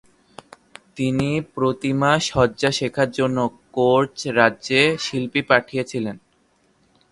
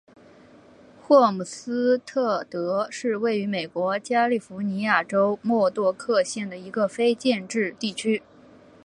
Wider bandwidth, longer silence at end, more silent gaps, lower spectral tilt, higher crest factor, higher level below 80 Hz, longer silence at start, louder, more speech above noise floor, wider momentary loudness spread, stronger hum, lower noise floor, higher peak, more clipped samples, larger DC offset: about the same, 11.5 kHz vs 11 kHz; first, 0.95 s vs 0.65 s; neither; about the same, -5 dB/octave vs -5 dB/octave; about the same, 20 dB vs 20 dB; first, -52 dBFS vs -72 dBFS; about the same, 0.95 s vs 1.05 s; first, -20 LUFS vs -24 LUFS; first, 42 dB vs 28 dB; about the same, 9 LU vs 8 LU; neither; first, -62 dBFS vs -51 dBFS; first, 0 dBFS vs -4 dBFS; neither; neither